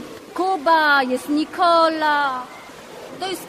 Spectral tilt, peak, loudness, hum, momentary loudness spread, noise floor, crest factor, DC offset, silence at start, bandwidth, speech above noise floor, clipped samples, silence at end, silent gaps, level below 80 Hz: -3 dB/octave; -4 dBFS; -18 LUFS; none; 22 LU; -38 dBFS; 16 dB; under 0.1%; 0 s; 15.5 kHz; 20 dB; under 0.1%; 0 s; none; -62 dBFS